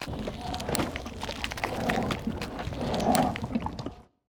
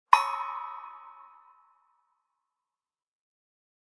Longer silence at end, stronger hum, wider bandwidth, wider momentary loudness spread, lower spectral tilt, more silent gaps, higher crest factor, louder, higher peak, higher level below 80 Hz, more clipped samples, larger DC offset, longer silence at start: second, 0.25 s vs 2.7 s; neither; first, over 20 kHz vs 11 kHz; second, 10 LU vs 26 LU; first, -5 dB/octave vs 1.5 dB/octave; neither; second, 22 dB vs 32 dB; second, -31 LUFS vs -28 LUFS; second, -8 dBFS vs -2 dBFS; first, -44 dBFS vs -78 dBFS; neither; neither; about the same, 0 s vs 0.1 s